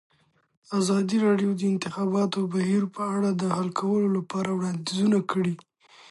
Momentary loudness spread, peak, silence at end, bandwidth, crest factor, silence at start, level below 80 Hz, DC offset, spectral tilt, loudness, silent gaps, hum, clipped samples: 5 LU; -10 dBFS; 0.55 s; 11.5 kHz; 16 dB; 0.7 s; -70 dBFS; under 0.1%; -6.5 dB/octave; -26 LUFS; none; none; under 0.1%